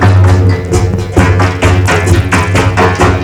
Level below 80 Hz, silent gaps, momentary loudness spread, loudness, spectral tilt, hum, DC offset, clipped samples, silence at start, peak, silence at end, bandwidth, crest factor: -20 dBFS; none; 4 LU; -9 LUFS; -6 dB/octave; none; under 0.1%; 0.8%; 0 s; 0 dBFS; 0 s; 12 kHz; 8 dB